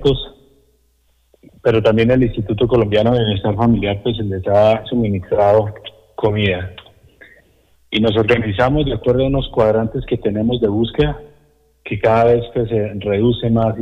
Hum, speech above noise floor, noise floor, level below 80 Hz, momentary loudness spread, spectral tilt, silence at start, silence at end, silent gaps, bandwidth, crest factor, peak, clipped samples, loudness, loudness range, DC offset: none; 43 dB; -59 dBFS; -34 dBFS; 8 LU; -8.5 dB/octave; 0 s; 0 s; none; 7.4 kHz; 12 dB; -4 dBFS; under 0.1%; -16 LUFS; 3 LU; under 0.1%